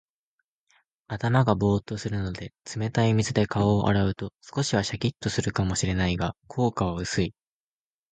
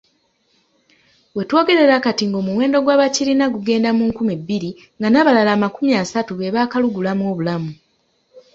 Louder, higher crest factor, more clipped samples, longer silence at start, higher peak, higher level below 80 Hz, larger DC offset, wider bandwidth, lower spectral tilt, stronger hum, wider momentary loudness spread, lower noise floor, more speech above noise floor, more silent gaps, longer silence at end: second, -26 LUFS vs -17 LUFS; about the same, 20 dB vs 16 dB; neither; second, 1.1 s vs 1.35 s; second, -6 dBFS vs -2 dBFS; first, -44 dBFS vs -58 dBFS; neither; first, 9.4 kHz vs 7.8 kHz; about the same, -5.5 dB/octave vs -5 dB/octave; neither; about the same, 9 LU vs 11 LU; first, under -90 dBFS vs -63 dBFS; first, over 65 dB vs 47 dB; neither; first, 0.8 s vs 0.15 s